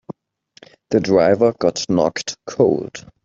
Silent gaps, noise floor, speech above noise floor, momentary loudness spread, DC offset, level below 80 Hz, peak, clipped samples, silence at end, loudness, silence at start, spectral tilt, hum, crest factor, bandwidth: none; -55 dBFS; 38 dB; 12 LU; under 0.1%; -56 dBFS; -2 dBFS; under 0.1%; 0.25 s; -18 LUFS; 0.9 s; -5.5 dB/octave; none; 16 dB; 7.8 kHz